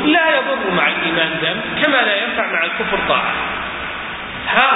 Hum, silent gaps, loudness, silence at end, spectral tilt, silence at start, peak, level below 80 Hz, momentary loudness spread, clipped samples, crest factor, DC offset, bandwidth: none; none; -16 LUFS; 0 s; -7.5 dB/octave; 0 s; 0 dBFS; -46 dBFS; 10 LU; under 0.1%; 18 dB; under 0.1%; 4 kHz